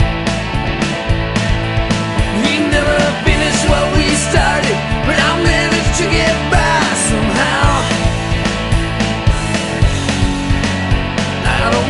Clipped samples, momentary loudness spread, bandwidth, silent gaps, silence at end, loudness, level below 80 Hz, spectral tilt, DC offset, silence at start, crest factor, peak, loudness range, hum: under 0.1%; 4 LU; 11.5 kHz; none; 0 s; -14 LUFS; -20 dBFS; -4.5 dB/octave; under 0.1%; 0 s; 14 dB; 0 dBFS; 3 LU; none